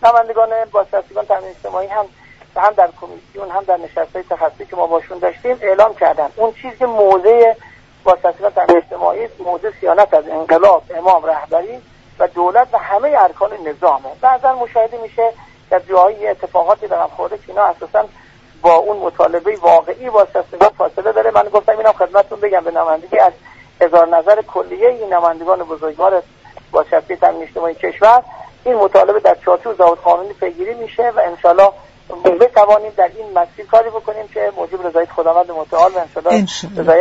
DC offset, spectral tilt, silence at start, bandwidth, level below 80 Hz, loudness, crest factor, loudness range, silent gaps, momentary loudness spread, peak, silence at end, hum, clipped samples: under 0.1%; -5.5 dB/octave; 0 s; 8 kHz; -50 dBFS; -14 LUFS; 14 dB; 4 LU; none; 10 LU; 0 dBFS; 0 s; none; under 0.1%